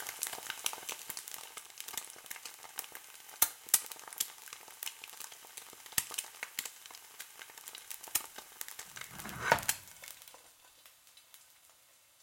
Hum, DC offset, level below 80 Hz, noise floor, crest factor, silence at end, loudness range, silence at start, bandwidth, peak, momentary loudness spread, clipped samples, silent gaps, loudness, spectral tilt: none; under 0.1%; -72 dBFS; -64 dBFS; 36 dB; 0 s; 6 LU; 0 s; 17 kHz; -6 dBFS; 22 LU; under 0.1%; none; -38 LUFS; 0 dB/octave